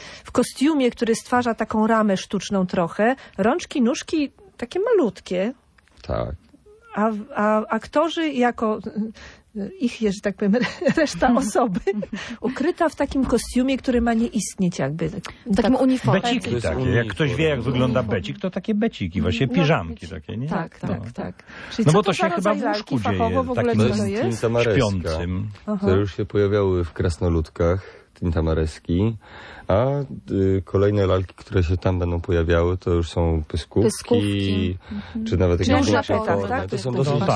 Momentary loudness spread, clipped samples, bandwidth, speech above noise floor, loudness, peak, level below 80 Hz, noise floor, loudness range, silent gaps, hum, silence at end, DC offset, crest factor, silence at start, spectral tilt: 10 LU; under 0.1%; 11 kHz; 28 dB; -22 LUFS; -4 dBFS; -40 dBFS; -49 dBFS; 3 LU; none; none; 0 s; under 0.1%; 18 dB; 0 s; -6.5 dB/octave